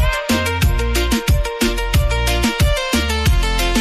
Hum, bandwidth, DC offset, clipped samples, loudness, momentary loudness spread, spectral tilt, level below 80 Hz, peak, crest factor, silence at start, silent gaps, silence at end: none; 15.5 kHz; under 0.1%; under 0.1%; -17 LUFS; 2 LU; -4.5 dB/octave; -20 dBFS; -6 dBFS; 10 dB; 0 s; none; 0 s